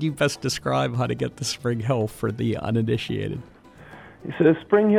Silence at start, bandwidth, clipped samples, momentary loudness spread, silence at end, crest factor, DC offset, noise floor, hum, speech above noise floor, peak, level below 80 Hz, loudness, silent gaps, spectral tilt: 0 s; 15 kHz; under 0.1%; 15 LU; 0 s; 18 dB; under 0.1%; -46 dBFS; none; 23 dB; -6 dBFS; -52 dBFS; -24 LUFS; none; -6 dB/octave